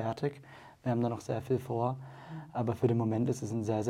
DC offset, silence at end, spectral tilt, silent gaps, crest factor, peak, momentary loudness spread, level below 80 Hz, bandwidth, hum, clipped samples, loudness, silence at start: under 0.1%; 0 s; -8 dB/octave; none; 18 dB; -14 dBFS; 15 LU; -66 dBFS; 14 kHz; none; under 0.1%; -33 LUFS; 0 s